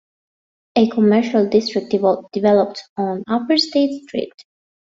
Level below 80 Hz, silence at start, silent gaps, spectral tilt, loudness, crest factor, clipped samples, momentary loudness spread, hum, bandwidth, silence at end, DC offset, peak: -62 dBFS; 0.75 s; 2.89-2.96 s; -6 dB/octave; -18 LUFS; 16 dB; under 0.1%; 10 LU; none; 7.8 kHz; 0.65 s; under 0.1%; -2 dBFS